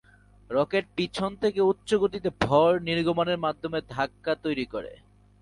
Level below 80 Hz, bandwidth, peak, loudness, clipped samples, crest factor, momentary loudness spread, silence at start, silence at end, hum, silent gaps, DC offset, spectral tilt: -54 dBFS; 11.5 kHz; -8 dBFS; -26 LUFS; under 0.1%; 20 dB; 9 LU; 0.5 s; 0.45 s; none; none; under 0.1%; -6 dB/octave